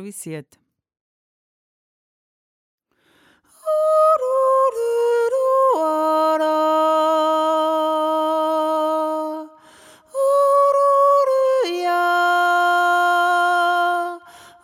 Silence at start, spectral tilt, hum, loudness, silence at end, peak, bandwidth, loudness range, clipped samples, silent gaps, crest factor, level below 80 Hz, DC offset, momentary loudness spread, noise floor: 0 s; -3.5 dB/octave; none; -18 LUFS; 0.25 s; -8 dBFS; 16 kHz; 4 LU; under 0.1%; 1.01-2.78 s; 12 dB; -80 dBFS; under 0.1%; 9 LU; -59 dBFS